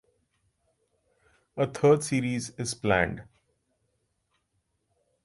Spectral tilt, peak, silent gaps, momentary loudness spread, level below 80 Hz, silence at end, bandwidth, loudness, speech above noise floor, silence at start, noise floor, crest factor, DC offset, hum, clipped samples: -5.5 dB/octave; -8 dBFS; none; 12 LU; -56 dBFS; 2 s; 11.5 kHz; -27 LUFS; 50 dB; 1.55 s; -76 dBFS; 22 dB; under 0.1%; none; under 0.1%